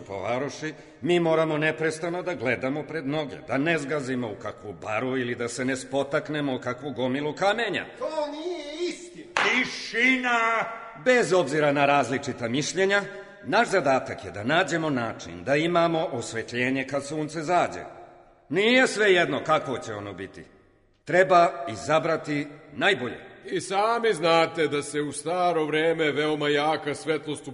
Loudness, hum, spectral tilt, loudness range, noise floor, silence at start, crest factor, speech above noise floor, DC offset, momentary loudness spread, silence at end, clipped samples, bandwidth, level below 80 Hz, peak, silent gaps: -25 LUFS; none; -4.5 dB/octave; 5 LU; -60 dBFS; 0 s; 20 dB; 35 dB; under 0.1%; 12 LU; 0 s; under 0.1%; 11 kHz; -64 dBFS; -4 dBFS; none